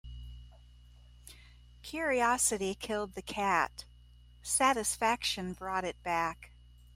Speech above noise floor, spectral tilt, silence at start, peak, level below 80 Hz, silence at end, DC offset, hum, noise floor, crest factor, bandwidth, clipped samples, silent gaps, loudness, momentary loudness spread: 25 dB; -2 dB/octave; 0.05 s; -14 dBFS; -54 dBFS; 0.45 s; under 0.1%; 60 Hz at -55 dBFS; -57 dBFS; 20 dB; 16 kHz; under 0.1%; none; -32 LUFS; 22 LU